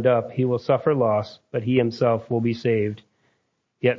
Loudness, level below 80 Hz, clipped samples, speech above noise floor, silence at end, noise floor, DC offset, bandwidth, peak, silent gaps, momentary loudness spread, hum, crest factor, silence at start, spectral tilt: -23 LUFS; -60 dBFS; under 0.1%; 50 dB; 0 s; -72 dBFS; under 0.1%; 7.2 kHz; -6 dBFS; none; 8 LU; none; 18 dB; 0 s; -8.5 dB/octave